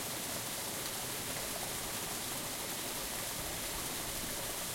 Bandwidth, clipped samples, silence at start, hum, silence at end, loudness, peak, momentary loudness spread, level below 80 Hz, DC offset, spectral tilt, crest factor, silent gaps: 16.5 kHz; under 0.1%; 0 s; none; 0 s; -37 LUFS; -24 dBFS; 0 LU; -56 dBFS; under 0.1%; -1.5 dB/octave; 16 dB; none